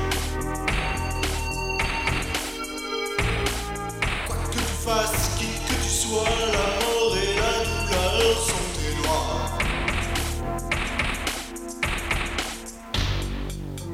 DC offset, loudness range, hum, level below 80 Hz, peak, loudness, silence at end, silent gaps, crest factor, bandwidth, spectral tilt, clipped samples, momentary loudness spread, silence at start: under 0.1%; 4 LU; none; -32 dBFS; -6 dBFS; -25 LUFS; 0 s; none; 18 dB; 16.5 kHz; -3.5 dB/octave; under 0.1%; 7 LU; 0 s